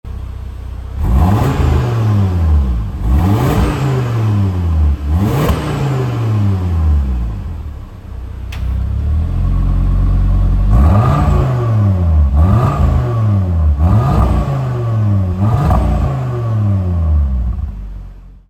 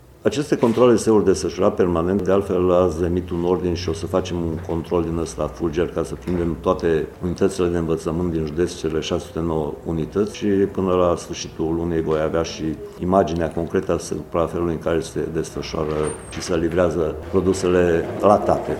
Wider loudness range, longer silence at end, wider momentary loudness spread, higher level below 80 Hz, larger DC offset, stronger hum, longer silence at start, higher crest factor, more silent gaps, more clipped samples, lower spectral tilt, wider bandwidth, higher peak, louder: about the same, 5 LU vs 5 LU; about the same, 0.1 s vs 0 s; first, 14 LU vs 8 LU; first, -18 dBFS vs -40 dBFS; neither; neither; second, 0.05 s vs 0.25 s; second, 12 dB vs 20 dB; neither; neither; first, -8.5 dB/octave vs -6.5 dB/octave; second, 13.5 kHz vs 15.5 kHz; about the same, 0 dBFS vs 0 dBFS; first, -14 LUFS vs -21 LUFS